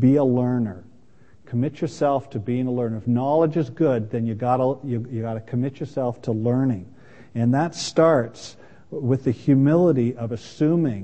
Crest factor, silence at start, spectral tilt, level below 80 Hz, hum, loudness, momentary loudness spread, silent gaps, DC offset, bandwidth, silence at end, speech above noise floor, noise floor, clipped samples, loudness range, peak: 18 dB; 0 s; -7.5 dB/octave; -60 dBFS; none; -22 LUFS; 12 LU; none; 0.4%; 8.6 kHz; 0 s; 33 dB; -55 dBFS; under 0.1%; 4 LU; -4 dBFS